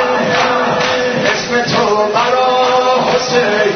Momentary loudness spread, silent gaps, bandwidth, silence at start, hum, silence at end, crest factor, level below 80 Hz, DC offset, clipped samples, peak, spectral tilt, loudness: 2 LU; none; 6.6 kHz; 0 s; none; 0 s; 12 dB; -48 dBFS; under 0.1%; under 0.1%; 0 dBFS; -3.5 dB/octave; -12 LUFS